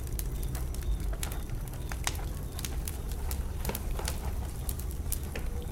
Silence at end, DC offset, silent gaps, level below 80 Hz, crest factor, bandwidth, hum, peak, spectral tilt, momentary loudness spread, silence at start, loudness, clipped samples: 0 s; under 0.1%; none; -36 dBFS; 24 dB; 17 kHz; none; -10 dBFS; -4.5 dB/octave; 3 LU; 0 s; -36 LUFS; under 0.1%